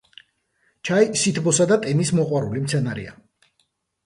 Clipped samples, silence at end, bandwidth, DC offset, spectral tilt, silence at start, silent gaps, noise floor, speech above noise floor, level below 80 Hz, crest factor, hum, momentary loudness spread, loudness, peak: under 0.1%; 0.95 s; 11.5 kHz; under 0.1%; -5 dB/octave; 0.85 s; none; -69 dBFS; 49 dB; -58 dBFS; 18 dB; none; 13 LU; -20 LUFS; -4 dBFS